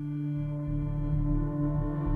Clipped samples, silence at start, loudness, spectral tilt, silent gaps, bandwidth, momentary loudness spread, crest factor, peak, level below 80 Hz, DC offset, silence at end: under 0.1%; 0 s; -31 LUFS; -11.5 dB/octave; none; 3.4 kHz; 3 LU; 12 dB; -18 dBFS; -36 dBFS; under 0.1%; 0 s